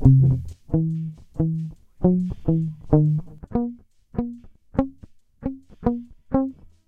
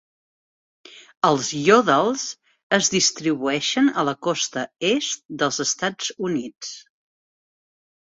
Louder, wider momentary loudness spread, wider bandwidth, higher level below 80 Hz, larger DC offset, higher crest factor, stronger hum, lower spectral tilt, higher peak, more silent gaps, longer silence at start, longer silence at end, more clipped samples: second, -25 LUFS vs -21 LUFS; about the same, 14 LU vs 12 LU; second, 2.6 kHz vs 8 kHz; first, -38 dBFS vs -66 dBFS; neither; about the same, 22 dB vs 20 dB; neither; first, -12 dB/octave vs -3 dB/octave; about the same, -2 dBFS vs -2 dBFS; second, none vs 1.17-1.21 s, 2.63-2.70 s, 5.25-5.29 s; second, 0 s vs 0.9 s; second, 0.35 s vs 1.2 s; neither